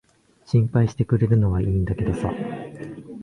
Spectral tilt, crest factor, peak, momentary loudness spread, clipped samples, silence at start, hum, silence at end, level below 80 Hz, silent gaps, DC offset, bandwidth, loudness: -9 dB/octave; 16 dB; -6 dBFS; 16 LU; under 0.1%; 0.5 s; none; 0 s; -38 dBFS; none; under 0.1%; 10 kHz; -22 LUFS